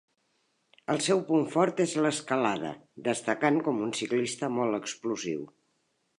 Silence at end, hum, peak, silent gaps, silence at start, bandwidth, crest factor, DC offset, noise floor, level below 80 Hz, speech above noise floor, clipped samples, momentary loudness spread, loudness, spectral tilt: 0.75 s; none; -10 dBFS; none; 0.9 s; 11.5 kHz; 20 dB; under 0.1%; -75 dBFS; -76 dBFS; 46 dB; under 0.1%; 9 LU; -29 LUFS; -4.5 dB/octave